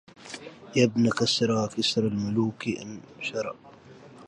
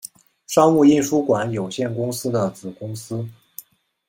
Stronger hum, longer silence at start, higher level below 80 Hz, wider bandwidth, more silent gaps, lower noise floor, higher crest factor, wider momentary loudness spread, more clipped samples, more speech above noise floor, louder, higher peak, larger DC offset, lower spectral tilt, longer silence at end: neither; second, 0.2 s vs 0.5 s; about the same, -62 dBFS vs -60 dBFS; second, 11.5 kHz vs 16.5 kHz; neither; first, -49 dBFS vs -44 dBFS; about the same, 20 dB vs 18 dB; second, 18 LU vs 22 LU; neither; about the same, 23 dB vs 25 dB; second, -26 LUFS vs -20 LUFS; second, -8 dBFS vs -2 dBFS; neither; about the same, -5 dB/octave vs -6 dB/octave; second, 0 s vs 0.5 s